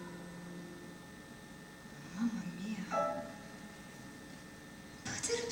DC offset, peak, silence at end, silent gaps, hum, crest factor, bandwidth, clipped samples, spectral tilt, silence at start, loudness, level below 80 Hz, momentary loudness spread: under 0.1%; -22 dBFS; 0 s; none; none; 20 dB; 19 kHz; under 0.1%; -4 dB/octave; 0 s; -43 LUFS; -68 dBFS; 15 LU